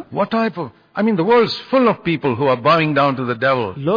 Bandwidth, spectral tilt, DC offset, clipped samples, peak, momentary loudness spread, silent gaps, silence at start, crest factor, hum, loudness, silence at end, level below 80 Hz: 5.2 kHz; -8 dB/octave; under 0.1%; under 0.1%; -4 dBFS; 6 LU; none; 0 s; 12 dB; none; -17 LUFS; 0 s; -56 dBFS